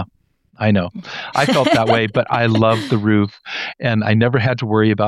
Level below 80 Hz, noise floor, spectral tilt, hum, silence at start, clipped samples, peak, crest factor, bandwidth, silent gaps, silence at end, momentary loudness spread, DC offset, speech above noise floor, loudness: -52 dBFS; -57 dBFS; -6.5 dB/octave; none; 0 s; under 0.1%; -2 dBFS; 16 dB; 12.5 kHz; none; 0 s; 10 LU; under 0.1%; 41 dB; -17 LUFS